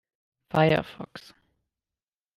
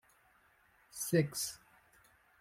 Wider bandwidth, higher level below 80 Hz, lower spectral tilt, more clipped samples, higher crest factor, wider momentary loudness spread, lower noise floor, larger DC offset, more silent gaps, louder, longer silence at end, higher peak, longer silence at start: second, 13 kHz vs 16.5 kHz; first, -58 dBFS vs -74 dBFS; first, -7.5 dB/octave vs -4.5 dB/octave; neither; about the same, 20 dB vs 22 dB; about the same, 20 LU vs 19 LU; first, under -90 dBFS vs -69 dBFS; neither; neither; first, -24 LUFS vs -35 LUFS; first, 1.15 s vs 0.85 s; first, -10 dBFS vs -18 dBFS; second, 0.55 s vs 0.95 s